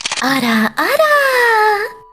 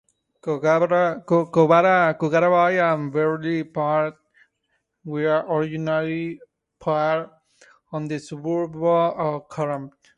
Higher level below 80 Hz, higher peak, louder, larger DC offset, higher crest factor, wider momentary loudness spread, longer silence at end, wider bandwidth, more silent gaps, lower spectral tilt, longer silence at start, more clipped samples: first, -52 dBFS vs -66 dBFS; about the same, -2 dBFS vs -4 dBFS; first, -13 LUFS vs -21 LUFS; neither; second, 12 dB vs 18 dB; second, 4 LU vs 14 LU; second, 0.15 s vs 0.3 s; first, 16 kHz vs 9.8 kHz; neither; second, -3 dB/octave vs -7.5 dB/octave; second, 0.05 s vs 0.45 s; neither